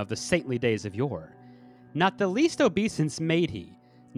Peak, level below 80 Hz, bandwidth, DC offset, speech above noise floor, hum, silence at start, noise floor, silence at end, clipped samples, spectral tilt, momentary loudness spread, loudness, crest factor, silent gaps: -10 dBFS; -60 dBFS; 12 kHz; under 0.1%; 25 dB; none; 0 s; -51 dBFS; 0 s; under 0.1%; -5.5 dB/octave; 8 LU; -27 LUFS; 18 dB; none